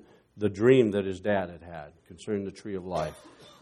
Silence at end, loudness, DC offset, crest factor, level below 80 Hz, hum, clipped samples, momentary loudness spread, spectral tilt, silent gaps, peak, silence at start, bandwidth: 0.15 s; -28 LUFS; under 0.1%; 20 dB; -60 dBFS; none; under 0.1%; 22 LU; -7 dB/octave; none; -8 dBFS; 0.35 s; 11 kHz